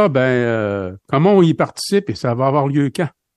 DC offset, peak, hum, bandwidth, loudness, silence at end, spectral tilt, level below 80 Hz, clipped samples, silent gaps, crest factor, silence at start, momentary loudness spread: under 0.1%; -2 dBFS; none; 12.5 kHz; -17 LUFS; 0.3 s; -6.5 dB/octave; -58 dBFS; under 0.1%; none; 14 dB; 0 s; 9 LU